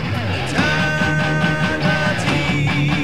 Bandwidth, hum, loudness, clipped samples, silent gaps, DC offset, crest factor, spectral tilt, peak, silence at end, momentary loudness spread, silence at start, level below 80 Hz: 13.5 kHz; none; -18 LUFS; under 0.1%; none; 2%; 14 dB; -5.5 dB/octave; -4 dBFS; 0 s; 2 LU; 0 s; -38 dBFS